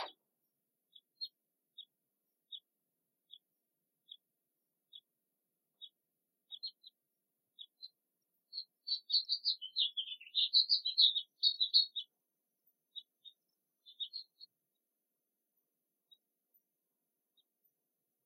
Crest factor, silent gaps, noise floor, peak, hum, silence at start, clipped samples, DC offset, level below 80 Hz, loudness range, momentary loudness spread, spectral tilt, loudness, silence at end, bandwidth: 26 dB; none; -88 dBFS; -16 dBFS; none; 0 s; under 0.1%; under 0.1%; under -90 dBFS; 23 LU; 28 LU; 1.5 dB/octave; -32 LUFS; 3.8 s; 16 kHz